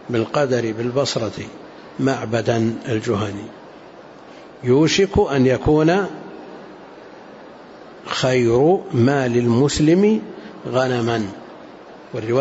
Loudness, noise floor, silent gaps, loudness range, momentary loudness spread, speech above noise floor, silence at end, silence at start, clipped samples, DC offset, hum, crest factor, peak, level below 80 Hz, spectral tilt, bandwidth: -19 LUFS; -41 dBFS; none; 5 LU; 24 LU; 23 dB; 0 s; 0 s; under 0.1%; under 0.1%; none; 14 dB; -6 dBFS; -44 dBFS; -6 dB/octave; 8 kHz